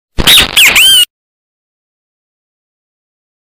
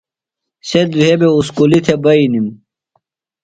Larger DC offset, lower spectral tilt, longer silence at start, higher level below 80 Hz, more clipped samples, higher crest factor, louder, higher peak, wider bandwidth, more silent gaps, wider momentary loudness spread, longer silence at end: neither; second, 0 dB/octave vs -6.5 dB/octave; second, 0.2 s vs 0.65 s; first, -28 dBFS vs -50 dBFS; first, 0.8% vs under 0.1%; about the same, 12 dB vs 14 dB; first, -3 LUFS vs -12 LUFS; about the same, 0 dBFS vs 0 dBFS; first, over 20 kHz vs 9.6 kHz; neither; second, 4 LU vs 8 LU; first, 2.5 s vs 0.9 s